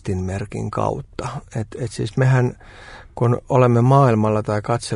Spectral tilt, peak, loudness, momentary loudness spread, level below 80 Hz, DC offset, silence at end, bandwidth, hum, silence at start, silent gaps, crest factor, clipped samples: -7.5 dB/octave; -4 dBFS; -19 LUFS; 15 LU; -46 dBFS; under 0.1%; 0 s; 11 kHz; none; 0.05 s; none; 16 dB; under 0.1%